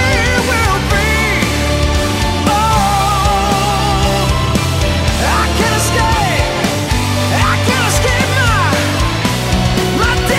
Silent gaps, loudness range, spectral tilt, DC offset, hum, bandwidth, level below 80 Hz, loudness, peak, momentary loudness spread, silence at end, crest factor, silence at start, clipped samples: none; 1 LU; -4.5 dB/octave; under 0.1%; none; 16.5 kHz; -20 dBFS; -13 LUFS; -2 dBFS; 3 LU; 0 s; 10 dB; 0 s; under 0.1%